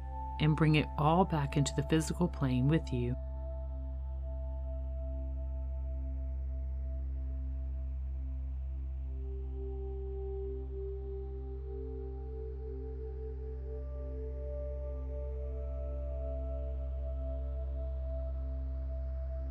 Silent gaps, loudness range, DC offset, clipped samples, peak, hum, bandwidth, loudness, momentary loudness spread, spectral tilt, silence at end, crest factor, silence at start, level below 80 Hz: none; 9 LU; under 0.1%; under 0.1%; -14 dBFS; none; 11.5 kHz; -37 LUFS; 12 LU; -7 dB/octave; 0 s; 20 dB; 0 s; -38 dBFS